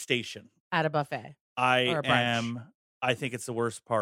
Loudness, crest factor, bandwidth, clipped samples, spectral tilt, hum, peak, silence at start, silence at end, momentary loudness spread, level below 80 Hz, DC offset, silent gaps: -29 LUFS; 20 dB; 16 kHz; under 0.1%; -4.5 dB/octave; none; -8 dBFS; 0 s; 0 s; 15 LU; -68 dBFS; under 0.1%; 0.60-0.71 s, 1.41-1.56 s, 2.75-3.01 s